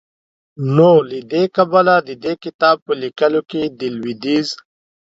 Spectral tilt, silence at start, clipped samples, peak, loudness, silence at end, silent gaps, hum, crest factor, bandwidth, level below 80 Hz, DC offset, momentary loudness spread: -6.5 dB/octave; 0.6 s; under 0.1%; 0 dBFS; -16 LUFS; 0.45 s; 2.54-2.59 s, 2.82-2.86 s; none; 16 dB; 7.8 kHz; -62 dBFS; under 0.1%; 12 LU